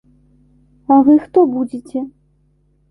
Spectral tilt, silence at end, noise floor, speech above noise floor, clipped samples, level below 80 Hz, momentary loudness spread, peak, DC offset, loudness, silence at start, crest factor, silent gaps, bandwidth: -9 dB/octave; 0.85 s; -58 dBFS; 44 dB; under 0.1%; -56 dBFS; 18 LU; -2 dBFS; under 0.1%; -14 LUFS; 0.9 s; 14 dB; none; 3.2 kHz